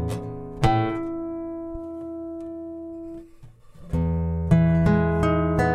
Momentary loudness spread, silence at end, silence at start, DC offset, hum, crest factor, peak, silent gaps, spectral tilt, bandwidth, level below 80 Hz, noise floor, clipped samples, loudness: 16 LU; 0 s; 0 s; under 0.1%; none; 18 dB; -6 dBFS; none; -8.5 dB/octave; 10 kHz; -36 dBFS; -47 dBFS; under 0.1%; -24 LUFS